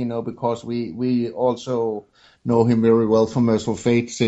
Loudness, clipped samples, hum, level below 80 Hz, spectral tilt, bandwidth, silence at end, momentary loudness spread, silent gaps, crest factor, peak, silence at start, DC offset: -20 LUFS; under 0.1%; none; -56 dBFS; -7 dB/octave; 8.2 kHz; 0 s; 10 LU; none; 16 dB; -4 dBFS; 0 s; under 0.1%